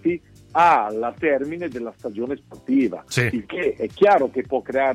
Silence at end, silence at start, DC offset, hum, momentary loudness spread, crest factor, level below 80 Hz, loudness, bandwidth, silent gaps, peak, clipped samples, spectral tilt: 0 s; 0.05 s; under 0.1%; none; 13 LU; 16 dB; -56 dBFS; -21 LUFS; 15 kHz; none; -4 dBFS; under 0.1%; -6 dB/octave